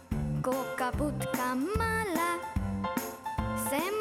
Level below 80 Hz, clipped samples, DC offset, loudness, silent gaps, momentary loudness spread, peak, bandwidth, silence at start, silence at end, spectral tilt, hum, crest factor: -44 dBFS; under 0.1%; under 0.1%; -32 LUFS; none; 5 LU; -16 dBFS; 20 kHz; 0 s; 0 s; -5 dB/octave; none; 14 dB